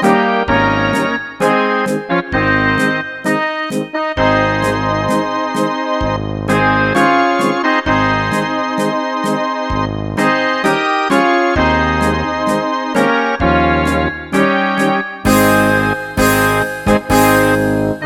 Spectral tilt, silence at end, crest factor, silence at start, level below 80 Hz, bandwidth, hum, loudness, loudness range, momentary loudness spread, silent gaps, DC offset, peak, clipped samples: -5 dB/octave; 0 s; 14 dB; 0 s; -32 dBFS; 18.5 kHz; none; -14 LUFS; 3 LU; 6 LU; none; under 0.1%; 0 dBFS; under 0.1%